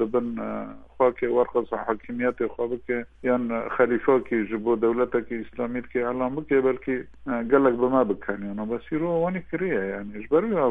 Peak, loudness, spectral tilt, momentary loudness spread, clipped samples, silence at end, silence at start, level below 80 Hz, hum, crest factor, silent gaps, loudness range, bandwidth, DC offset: -6 dBFS; -25 LUFS; -9.5 dB/octave; 9 LU; under 0.1%; 0 s; 0 s; -54 dBFS; none; 18 dB; none; 2 LU; 3.8 kHz; under 0.1%